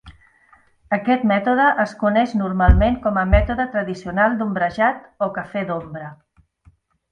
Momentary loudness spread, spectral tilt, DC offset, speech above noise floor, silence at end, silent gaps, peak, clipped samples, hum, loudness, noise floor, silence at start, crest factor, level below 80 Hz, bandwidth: 10 LU; -8 dB/octave; under 0.1%; 37 dB; 0.95 s; none; 0 dBFS; under 0.1%; none; -19 LUFS; -55 dBFS; 0.05 s; 20 dB; -28 dBFS; 8.6 kHz